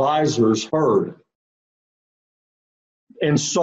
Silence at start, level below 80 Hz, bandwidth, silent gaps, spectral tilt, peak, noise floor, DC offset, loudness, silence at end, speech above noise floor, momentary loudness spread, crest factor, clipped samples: 0 s; -62 dBFS; 8.6 kHz; 1.35-3.07 s; -5 dB/octave; -6 dBFS; under -90 dBFS; under 0.1%; -19 LUFS; 0 s; over 71 dB; 6 LU; 16 dB; under 0.1%